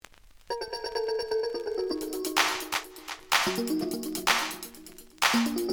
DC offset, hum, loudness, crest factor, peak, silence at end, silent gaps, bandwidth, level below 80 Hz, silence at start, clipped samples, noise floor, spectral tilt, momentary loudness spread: under 0.1%; none; -28 LUFS; 22 dB; -8 dBFS; 0 s; none; over 20 kHz; -60 dBFS; 0.5 s; under 0.1%; -53 dBFS; -2 dB/octave; 14 LU